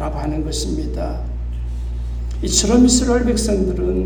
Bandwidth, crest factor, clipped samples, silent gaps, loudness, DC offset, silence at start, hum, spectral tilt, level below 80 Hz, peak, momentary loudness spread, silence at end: 19 kHz; 16 dB; under 0.1%; none; -19 LUFS; under 0.1%; 0 s; 60 Hz at -40 dBFS; -4.5 dB/octave; -24 dBFS; -2 dBFS; 14 LU; 0 s